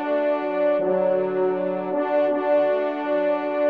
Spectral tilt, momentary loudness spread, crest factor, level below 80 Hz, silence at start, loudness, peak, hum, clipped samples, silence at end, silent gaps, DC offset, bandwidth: -8.5 dB/octave; 4 LU; 12 dB; -78 dBFS; 0 s; -22 LUFS; -10 dBFS; none; under 0.1%; 0 s; none; 0.1%; 4.9 kHz